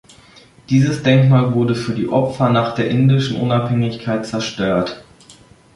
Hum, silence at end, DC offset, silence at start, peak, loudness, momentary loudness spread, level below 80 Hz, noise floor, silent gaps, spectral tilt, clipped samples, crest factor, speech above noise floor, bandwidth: none; 0.45 s; under 0.1%; 0.7 s; -2 dBFS; -17 LUFS; 8 LU; -50 dBFS; -46 dBFS; none; -7 dB/octave; under 0.1%; 14 dB; 30 dB; 11.5 kHz